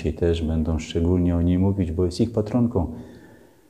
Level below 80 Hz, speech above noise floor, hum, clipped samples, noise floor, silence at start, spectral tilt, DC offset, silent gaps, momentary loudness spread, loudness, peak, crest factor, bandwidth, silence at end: -34 dBFS; 28 dB; none; under 0.1%; -50 dBFS; 0 s; -8 dB/octave; under 0.1%; none; 5 LU; -23 LUFS; -8 dBFS; 14 dB; 9.8 kHz; 0.45 s